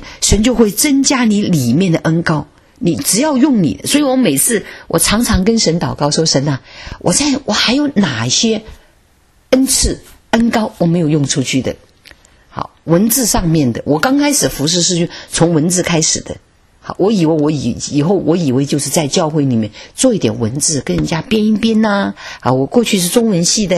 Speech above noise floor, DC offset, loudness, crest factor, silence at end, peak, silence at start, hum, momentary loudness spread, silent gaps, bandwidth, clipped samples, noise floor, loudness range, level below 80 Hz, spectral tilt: 38 dB; under 0.1%; -13 LUFS; 14 dB; 0 s; 0 dBFS; 0 s; none; 8 LU; none; 13.5 kHz; under 0.1%; -51 dBFS; 2 LU; -32 dBFS; -4 dB/octave